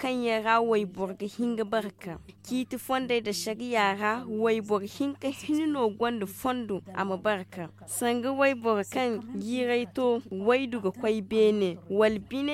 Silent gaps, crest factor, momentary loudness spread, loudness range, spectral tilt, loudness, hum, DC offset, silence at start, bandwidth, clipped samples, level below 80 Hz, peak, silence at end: none; 18 dB; 10 LU; 3 LU; -4.5 dB/octave; -28 LUFS; none; under 0.1%; 0 s; 16 kHz; under 0.1%; -64 dBFS; -10 dBFS; 0 s